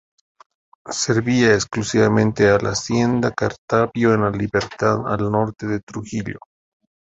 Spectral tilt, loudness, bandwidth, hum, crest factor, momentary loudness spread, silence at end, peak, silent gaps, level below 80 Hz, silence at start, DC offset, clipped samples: -5.5 dB/octave; -19 LUFS; 8.2 kHz; none; 18 dB; 11 LU; 0.65 s; -2 dBFS; 3.58-3.68 s, 5.83-5.87 s; -48 dBFS; 0.85 s; under 0.1%; under 0.1%